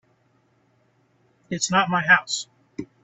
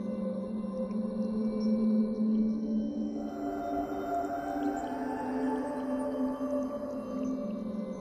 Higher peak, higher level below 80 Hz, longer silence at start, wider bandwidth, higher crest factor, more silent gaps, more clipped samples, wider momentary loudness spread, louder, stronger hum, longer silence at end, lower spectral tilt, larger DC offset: first, -2 dBFS vs -20 dBFS; second, -64 dBFS vs -58 dBFS; first, 1.5 s vs 0 s; second, 8.6 kHz vs 9.8 kHz; first, 22 dB vs 12 dB; neither; neither; first, 21 LU vs 7 LU; first, -21 LUFS vs -33 LUFS; neither; first, 0.2 s vs 0 s; second, -2.5 dB/octave vs -8 dB/octave; neither